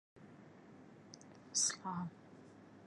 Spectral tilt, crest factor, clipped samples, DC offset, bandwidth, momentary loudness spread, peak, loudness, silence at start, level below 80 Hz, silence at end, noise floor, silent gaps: -1.5 dB/octave; 22 dB; under 0.1%; under 0.1%; 11.5 kHz; 25 LU; -24 dBFS; -38 LUFS; 0.15 s; -82 dBFS; 0 s; -59 dBFS; none